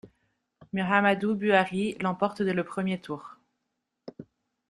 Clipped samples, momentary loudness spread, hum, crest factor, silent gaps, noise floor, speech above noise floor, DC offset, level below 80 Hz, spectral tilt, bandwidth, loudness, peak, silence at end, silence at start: under 0.1%; 16 LU; none; 22 dB; none; -82 dBFS; 55 dB; under 0.1%; -68 dBFS; -6.5 dB/octave; 11.5 kHz; -27 LUFS; -6 dBFS; 0.5 s; 0.05 s